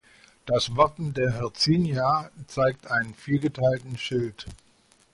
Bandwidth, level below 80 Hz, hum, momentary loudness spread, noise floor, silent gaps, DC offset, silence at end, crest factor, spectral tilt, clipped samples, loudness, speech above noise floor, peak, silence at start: 11.5 kHz; -52 dBFS; none; 10 LU; -61 dBFS; none; under 0.1%; 0.6 s; 20 dB; -5.5 dB/octave; under 0.1%; -25 LUFS; 36 dB; -6 dBFS; 0.45 s